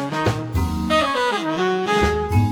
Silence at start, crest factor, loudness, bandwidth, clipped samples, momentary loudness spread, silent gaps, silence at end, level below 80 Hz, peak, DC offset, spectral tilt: 0 s; 16 dB; -20 LUFS; 18.5 kHz; under 0.1%; 4 LU; none; 0 s; -32 dBFS; -4 dBFS; under 0.1%; -5.5 dB/octave